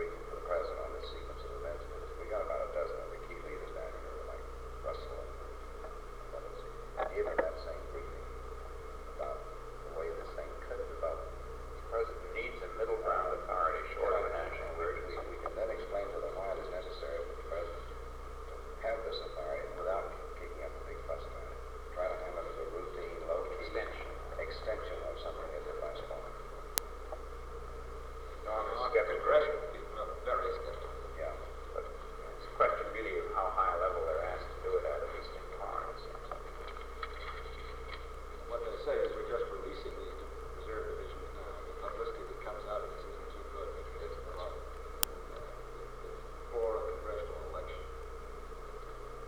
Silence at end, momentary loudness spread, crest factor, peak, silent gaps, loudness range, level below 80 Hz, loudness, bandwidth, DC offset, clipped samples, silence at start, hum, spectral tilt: 0 s; 13 LU; 38 dB; 0 dBFS; none; 8 LU; -48 dBFS; -39 LUFS; over 20 kHz; 0.2%; under 0.1%; 0 s; 60 Hz at -55 dBFS; -4.5 dB/octave